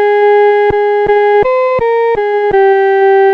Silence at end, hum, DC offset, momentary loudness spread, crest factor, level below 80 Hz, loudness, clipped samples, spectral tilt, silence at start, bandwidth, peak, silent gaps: 0 s; none; under 0.1%; 4 LU; 8 dB; -40 dBFS; -9 LUFS; under 0.1%; -6.5 dB/octave; 0 s; 5.2 kHz; 0 dBFS; none